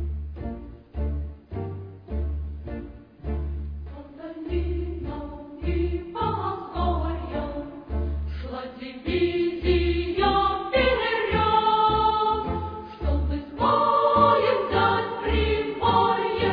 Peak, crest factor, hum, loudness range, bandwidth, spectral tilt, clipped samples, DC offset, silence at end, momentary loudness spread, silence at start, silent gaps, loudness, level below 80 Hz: -6 dBFS; 20 dB; none; 11 LU; 5 kHz; -9 dB/octave; under 0.1%; under 0.1%; 0 s; 16 LU; 0 s; none; -25 LUFS; -32 dBFS